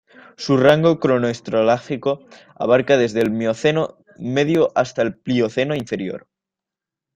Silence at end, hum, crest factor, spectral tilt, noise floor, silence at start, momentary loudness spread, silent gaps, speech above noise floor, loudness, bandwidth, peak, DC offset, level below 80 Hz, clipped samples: 0.95 s; none; 18 dB; -6 dB/octave; -87 dBFS; 0.4 s; 12 LU; none; 68 dB; -19 LUFS; 14 kHz; -2 dBFS; under 0.1%; -58 dBFS; under 0.1%